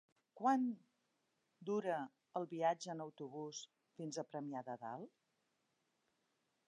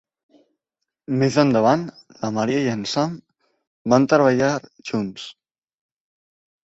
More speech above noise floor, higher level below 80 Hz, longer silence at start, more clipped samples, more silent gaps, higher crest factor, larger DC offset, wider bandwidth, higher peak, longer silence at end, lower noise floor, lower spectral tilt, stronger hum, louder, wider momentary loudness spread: second, 42 dB vs 63 dB; second, under -90 dBFS vs -60 dBFS; second, 0.35 s vs 1.1 s; neither; second, none vs 3.67-3.85 s; about the same, 22 dB vs 20 dB; neither; first, 10 kHz vs 8 kHz; second, -24 dBFS vs -2 dBFS; first, 1.6 s vs 1.35 s; about the same, -85 dBFS vs -82 dBFS; about the same, -5 dB/octave vs -6 dB/octave; neither; second, -43 LUFS vs -20 LUFS; about the same, 15 LU vs 16 LU